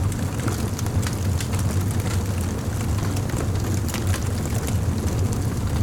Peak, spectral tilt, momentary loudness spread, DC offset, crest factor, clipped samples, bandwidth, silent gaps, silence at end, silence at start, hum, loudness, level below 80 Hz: -10 dBFS; -5.5 dB/octave; 2 LU; under 0.1%; 12 dB; under 0.1%; 18.5 kHz; none; 0 s; 0 s; none; -24 LUFS; -34 dBFS